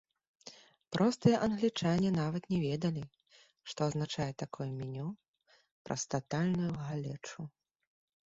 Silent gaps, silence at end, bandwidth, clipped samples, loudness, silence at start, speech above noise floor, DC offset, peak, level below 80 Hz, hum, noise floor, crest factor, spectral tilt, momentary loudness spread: 5.28-5.34 s, 5.72-5.85 s; 0.8 s; 7.8 kHz; under 0.1%; -34 LUFS; 0.45 s; 23 dB; under 0.1%; -14 dBFS; -66 dBFS; none; -57 dBFS; 22 dB; -6 dB/octave; 20 LU